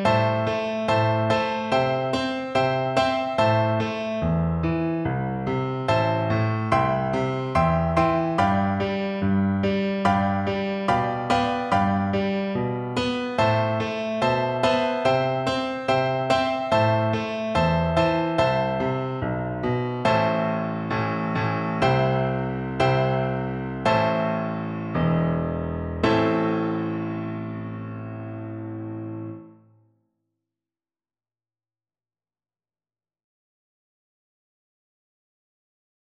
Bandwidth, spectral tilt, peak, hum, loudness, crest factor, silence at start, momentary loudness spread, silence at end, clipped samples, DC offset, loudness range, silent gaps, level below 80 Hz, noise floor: 10.5 kHz; -7 dB/octave; -6 dBFS; none; -23 LUFS; 18 dB; 0 s; 7 LU; 6.6 s; under 0.1%; under 0.1%; 5 LU; none; -46 dBFS; under -90 dBFS